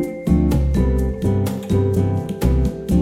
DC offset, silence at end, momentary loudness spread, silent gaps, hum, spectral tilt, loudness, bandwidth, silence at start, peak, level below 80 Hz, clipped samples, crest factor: under 0.1%; 0 s; 4 LU; none; none; -8.5 dB/octave; -19 LUFS; 16 kHz; 0 s; -4 dBFS; -22 dBFS; under 0.1%; 14 dB